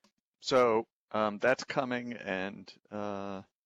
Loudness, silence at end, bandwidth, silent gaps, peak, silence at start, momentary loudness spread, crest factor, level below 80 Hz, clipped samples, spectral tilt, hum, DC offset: -32 LUFS; 0.25 s; 9.8 kHz; 0.93-1.08 s; -14 dBFS; 0.4 s; 14 LU; 18 dB; -74 dBFS; under 0.1%; -4.5 dB/octave; none; under 0.1%